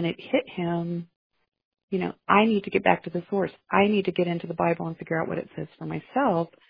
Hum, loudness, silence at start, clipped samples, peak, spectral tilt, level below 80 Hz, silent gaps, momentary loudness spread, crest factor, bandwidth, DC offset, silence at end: none; -26 LUFS; 0 s; under 0.1%; -4 dBFS; -9.5 dB/octave; -62 dBFS; 1.16-1.30 s, 1.65-1.72 s, 1.83-1.88 s; 11 LU; 22 dB; 5.2 kHz; under 0.1%; 0.2 s